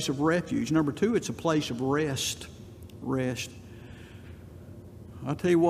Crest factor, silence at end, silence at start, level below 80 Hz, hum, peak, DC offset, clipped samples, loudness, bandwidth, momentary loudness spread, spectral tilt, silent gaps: 18 dB; 0 s; 0 s; -58 dBFS; none; -12 dBFS; under 0.1%; under 0.1%; -29 LUFS; 15 kHz; 20 LU; -5 dB/octave; none